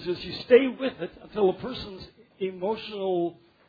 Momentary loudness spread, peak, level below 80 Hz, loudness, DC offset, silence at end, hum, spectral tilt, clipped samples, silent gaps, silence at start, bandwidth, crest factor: 17 LU; -6 dBFS; -58 dBFS; -27 LUFS; under 0.1%; 0.35 s; none; -7.5 dB/octave; under 0.1%; none; 0 s; 5 kHz; 22 dB